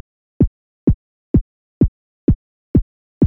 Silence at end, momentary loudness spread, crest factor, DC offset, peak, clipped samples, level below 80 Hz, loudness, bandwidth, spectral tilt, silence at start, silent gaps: 0 s; 3 LU; 14 dB; under 0.1%; -4 dBFS; under 0.1%; -28 dBFS; -20 LUFS; 2.8 kHz; -14 dB/octave; 0.4 s; 0.47-0.87 s, 0.94-1.34 s, 1.41-1.81 s, 1.88-2.28 s, 2.35-2.74 s, 2.82-3.21 s